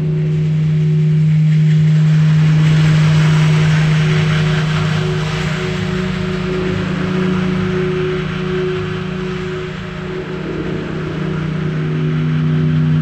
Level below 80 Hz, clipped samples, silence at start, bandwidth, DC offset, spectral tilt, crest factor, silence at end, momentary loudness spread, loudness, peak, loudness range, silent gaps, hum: -36 dBFS; under 0.1%; 0 s; 8.4 kHz; under 0.1%; -7.5 dB/octave; 12 dB; 0 s; 10 LU; -15 LUFS; -4 dBFS; 9 LU; none; none